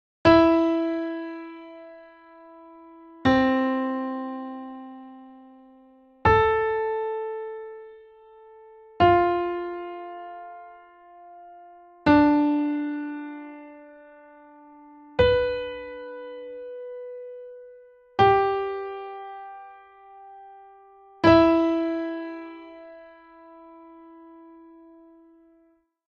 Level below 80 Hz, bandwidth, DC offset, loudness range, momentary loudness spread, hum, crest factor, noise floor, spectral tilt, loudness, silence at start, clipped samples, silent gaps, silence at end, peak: -50 dBFS; 6.6 kHz; under 0.1%; 5 LU; 26 LU; none; 22 dB; -63 dBFS; -7.5 dB/octave; -23 LUFS; 0.25 s; under 0.1%; none; 1.7 s; -4 dBFS